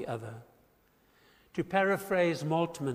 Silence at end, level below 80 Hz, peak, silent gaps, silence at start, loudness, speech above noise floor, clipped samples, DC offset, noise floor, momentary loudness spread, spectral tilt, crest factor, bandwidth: 0 s; -68 dBFS; -14 dBFS; none; 0 s; -31 LUFS; 36 dB; under 0.1%; under 0.1%; -67 dBFS; 14 LU; -6 dB/octave; 20 dB; 15.5 kHz